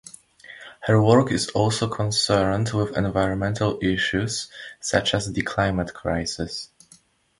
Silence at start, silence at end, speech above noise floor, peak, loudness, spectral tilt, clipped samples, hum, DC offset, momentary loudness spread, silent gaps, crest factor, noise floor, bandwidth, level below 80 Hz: 0.5 s; 0.75 s; 34 dB; -2 dBFS; -23 LUFS; -5 dB/octave; under 0.1%; none; under 0.1%; 13 LU; none; 20 dB; -56 dBFS; 11.5 kHz; -44 dBFS